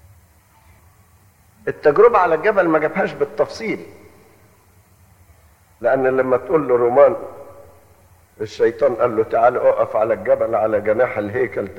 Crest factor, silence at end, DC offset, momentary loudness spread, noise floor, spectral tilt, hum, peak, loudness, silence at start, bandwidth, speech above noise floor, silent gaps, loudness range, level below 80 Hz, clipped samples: 18 dB; 0 s; under 0.1%; 13 LU; -52 dBFS; -7 dB/octave; none; -2 dBFS; -17 LUFS; 1.65 s; 16 kHz; 36 dB; none; 5 LU; -54 dBFS; under 0.1%